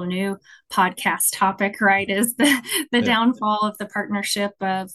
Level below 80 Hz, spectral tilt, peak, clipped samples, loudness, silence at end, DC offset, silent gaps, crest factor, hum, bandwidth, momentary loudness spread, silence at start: -66 dBFS; -3 dB/octave; -4 dBFS; under 0.1%; -20 LUFS; 0 s; under 0.1%; none; 16 dB; none; 13 kHz; 8 LU; 0 s